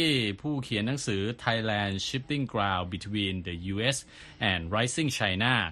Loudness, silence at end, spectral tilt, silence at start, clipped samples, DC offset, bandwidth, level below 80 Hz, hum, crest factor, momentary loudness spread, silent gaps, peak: -29 LUFS; 0 s; -4.5 dB/octave; 0 s; under 0.1%; under 0.1%; 12.5 kHz; -54 dBFS; none; 20 dB; 7 LU; none; -10 dBFS